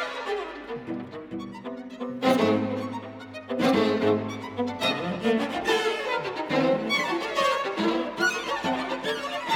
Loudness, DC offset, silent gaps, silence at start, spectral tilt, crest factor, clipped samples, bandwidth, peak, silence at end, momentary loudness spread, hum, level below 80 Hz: -26 LUFS; under 0.1%; none; 0 s; -4.5 dB/octave; 16 dB; under 0.1%; 18 kHz; -10 dBFS; 0 s; 14 LU; none; -62 dBFS